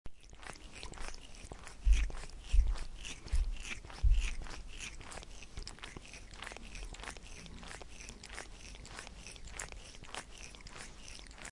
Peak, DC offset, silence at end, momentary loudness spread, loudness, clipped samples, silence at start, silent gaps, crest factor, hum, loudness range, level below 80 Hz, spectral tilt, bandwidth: -16 dBFS; under 0.1%; 0 s; 15 LU; -43 LUFS; under 0.1%; 0.05 s; none; 22 dB; none; 10 LU; -38 dBFS; -3.5 dB/octave; 11.5 kHz